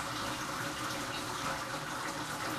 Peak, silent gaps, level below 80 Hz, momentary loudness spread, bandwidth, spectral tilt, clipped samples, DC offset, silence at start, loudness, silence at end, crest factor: -22 dBFS; none; -60 dBFS; 1 LU; 15.5 kHz; -3 dB/octave; under 0.1%; under 0.1%; 0 s; -37 LUFS; 0 s; 16 dB